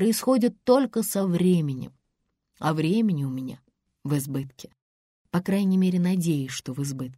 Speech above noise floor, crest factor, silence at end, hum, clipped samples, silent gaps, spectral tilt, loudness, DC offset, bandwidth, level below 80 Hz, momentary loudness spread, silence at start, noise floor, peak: 53 dB; 18 dB; 0.05 s; none; under 0.1%; 4.82-5.25 s; -6.5 dB/octave; -25 LUFS; under 0.1%; 16 kHz; -64 dBFS; 12 LU; 0 s; -77 dBFS; -8 dBFS